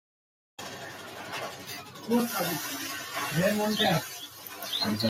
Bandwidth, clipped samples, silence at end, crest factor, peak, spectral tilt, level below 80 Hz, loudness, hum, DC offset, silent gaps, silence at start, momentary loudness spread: 16 kHz; under 0.1%; 0 s; 18 dB; -14 dBFS; -4 dB/octave; -68 dBFS; -30 LUFS; none; under 0.1%; none; 0.6 s; 15 LU